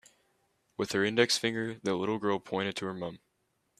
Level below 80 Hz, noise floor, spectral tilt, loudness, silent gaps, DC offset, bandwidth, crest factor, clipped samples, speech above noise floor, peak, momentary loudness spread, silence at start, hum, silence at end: -72 dBFS; -77 dBFS; -4 dB/octave; -31 LUFS; none; under 0.1%; 14.5 kHz; 24 dB; under 0.1%; 46 dB; -8 dBFS; 12 LU; 0.8 s; none; 0.65 s